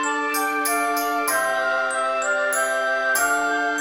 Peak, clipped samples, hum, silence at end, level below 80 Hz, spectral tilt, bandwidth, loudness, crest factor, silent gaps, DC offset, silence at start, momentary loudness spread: -10 dBFS; under 0.1%; none; 0 s; -64 dBFS; 0 dB/octave; 16 kHz; -21 LUFS; 12 dB; none; 0.1%; 0 s; 3 LU